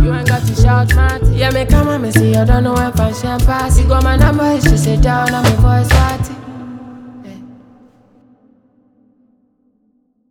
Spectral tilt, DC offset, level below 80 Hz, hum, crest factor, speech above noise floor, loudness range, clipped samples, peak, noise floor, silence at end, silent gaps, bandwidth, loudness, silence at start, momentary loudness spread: -6 dB/octave; under 0.1%; -18 dBFS; none; 12 dB; 48 dB; 6 LU; under 0.1%; 0 dBFS; -59 dBFS; 2.8 s; none; 18 kHz; -13 LUFS; 0 s; 18 LU